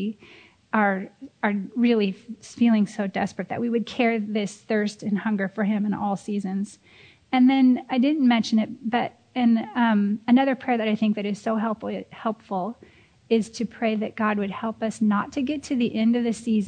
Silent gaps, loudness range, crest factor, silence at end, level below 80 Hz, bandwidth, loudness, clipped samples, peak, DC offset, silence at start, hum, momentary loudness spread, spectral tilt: none; 5 LU; 16 dB; 0 s; -66 dBFS; 9.4 kHz; -24 LUFS; under 0.1%; -6 dBFS; under 0.1%; 0 s; none; 10 LU; -6 dB/octave